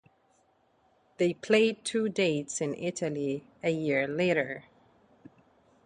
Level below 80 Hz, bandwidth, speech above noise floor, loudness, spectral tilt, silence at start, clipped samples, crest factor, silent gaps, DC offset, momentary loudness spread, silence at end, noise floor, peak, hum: -72 dBFS; 10.5 kHz; 39 dB; -29 LUFS; -4.5 dB/octave; 1.2 s; under 0.1%; 20 dB; none; under 0.1%; 9 LU; 1.25 s; -68 dBFS; -12 dBFS; none